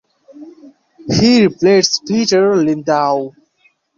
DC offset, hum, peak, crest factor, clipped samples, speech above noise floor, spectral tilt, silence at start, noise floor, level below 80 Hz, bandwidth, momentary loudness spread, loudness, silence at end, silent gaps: under 0.1%; none; -2 dBFS; 14 dB; under 0.1%; 45 dB; -4.5 dB/octave; 0.35 s; -57 dBFS; -48 dBFS; 7.4 kHz; 9 LU; -13 LUFS; 0.7 s; none